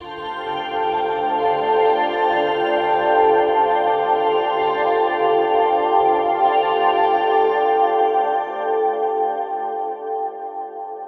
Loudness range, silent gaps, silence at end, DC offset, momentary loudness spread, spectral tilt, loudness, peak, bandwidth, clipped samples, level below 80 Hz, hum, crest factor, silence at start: 3 LU; none; 0 s; under 0.1%; 9 LU; -6 dB/octave; -18 LUFS; -4 dBFS; 5.8 kHz; under 0.1%; -60 dBFS; none; 14 dB; 0 s